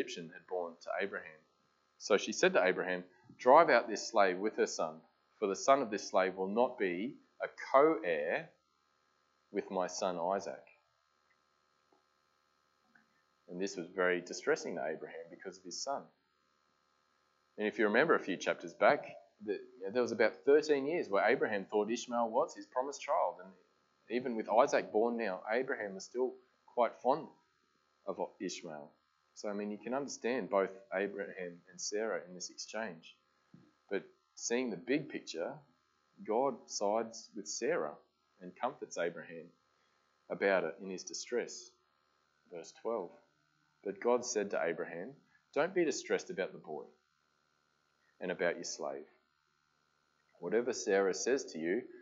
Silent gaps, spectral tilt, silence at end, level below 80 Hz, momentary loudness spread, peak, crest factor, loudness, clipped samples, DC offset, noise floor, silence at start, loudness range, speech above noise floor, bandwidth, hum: none; -3.5 dB/octave; 0 s; under -90 dBFS; 16 LU; -10 dBFS; 26 dB; -35 LUFS; under 0.1%; under 0.1%; -78 dBFS; 0 s; 10 LU; 43 dB; 8 kHz; none